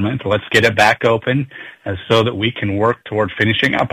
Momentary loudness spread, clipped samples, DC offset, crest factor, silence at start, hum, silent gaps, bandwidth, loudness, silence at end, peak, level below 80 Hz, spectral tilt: 11 LU; under 0.1%; under 0.1%; 14 dB; 0 s; none; none; 15.5 kHz; -15 LUFS; 0.05 s; -2 dBFS; -48 dBFS; -5.5 dB/octave